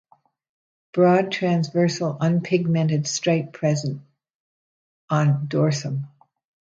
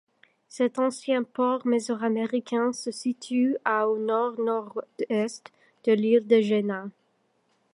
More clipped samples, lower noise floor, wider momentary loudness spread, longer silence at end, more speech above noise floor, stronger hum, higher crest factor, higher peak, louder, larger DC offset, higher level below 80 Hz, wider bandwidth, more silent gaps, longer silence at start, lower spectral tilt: neither; first, under -90 dBFS vs -70 dBFS; about the same, 11 LU vs 11 LU; second, 0.65 s vs 0.85 s; first, over 69 dB vs 45 dB; neither; about the same, 18 dB vs 18 dB; about the same, -6 dBFS vs -8 dBFS; first, -22 LUFS vs -26 LUFS; neither; first, -66 dBFS vs -80 dBFS; second, 7.8 kHz vs 11 kHz; first, 4.35-5.08 s vs none; first, 0.95 s vs 0.55 s; about the same, -6 dB/octave vs -5.5 dB/octave